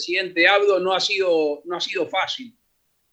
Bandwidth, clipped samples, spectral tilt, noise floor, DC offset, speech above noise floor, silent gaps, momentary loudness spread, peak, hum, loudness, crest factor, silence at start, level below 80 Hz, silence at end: 8.6 kHz; under 0.1%; -2.5 dB/octave; -69 dBFS; under 0.1%; 48 dB; none; 10 LU; -2 dBFS; none; -20 LUFS; 20 dB; 0 s; -72 dBFS; 0.65 s